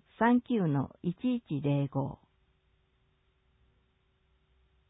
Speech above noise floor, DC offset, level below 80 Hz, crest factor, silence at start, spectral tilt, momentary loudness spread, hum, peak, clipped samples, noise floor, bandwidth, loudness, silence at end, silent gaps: 42 dB; under 0.1%; -66 dBFS; 18 dB; 0.2 s; -11.5 dB/octave; 9 LU; none; -14 dBFS; under 0.1%; -72 dBFS; 4 kHz; -31 LUFS; 2.75 s; none